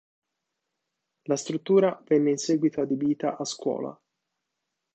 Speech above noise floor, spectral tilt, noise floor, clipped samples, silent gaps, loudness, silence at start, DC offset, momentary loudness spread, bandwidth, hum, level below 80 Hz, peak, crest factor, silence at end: 58 dB; -5.5 dB/octave; -83 dBFS; under 0.1%; none; -26 LUFS; 1.3 s; under 0.1%; 9 LU; 8.8 kHz; none; -76 dBFS; -10 dBFS; 18 dB; 1 s